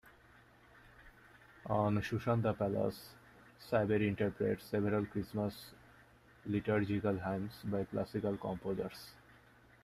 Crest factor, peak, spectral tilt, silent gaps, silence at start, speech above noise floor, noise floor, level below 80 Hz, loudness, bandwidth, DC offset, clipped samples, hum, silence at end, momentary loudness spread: 18 dB; -20 dBFS; -8 dB/octave; none; 0.05 s; 27 dB; -63 dBFS; -64 dBFS; -37 LUFS; 14.5 kHz; under 0.1%; under 0.1%; none; 0.7 s; 18 LU